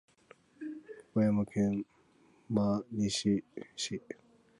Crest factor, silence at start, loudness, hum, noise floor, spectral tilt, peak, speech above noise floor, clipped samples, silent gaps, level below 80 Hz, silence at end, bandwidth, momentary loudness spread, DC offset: 20 dB; 0.6 s; -33 LUFS; none; -65 dBFS; -5.5 dB/octave; -16 dBFS; 33 dB; under 0.1%; none; -64 dBFS; 0.45 s; 11.5 kHz; 17 LU; under 0.1%